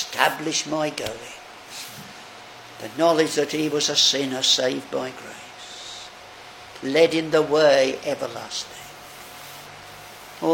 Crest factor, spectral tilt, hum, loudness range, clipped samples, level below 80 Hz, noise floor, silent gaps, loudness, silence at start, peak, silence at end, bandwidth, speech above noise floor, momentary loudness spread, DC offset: 24 dB; -2.5 dB/octave; none; 4 LU; under 0.1%; -64 dBFS; -42 dBFS; none; -21 LUFS; 0 s; 0 dBFS; 0 s; 17 kHz; 21 dB; 23 LU; under 0.1%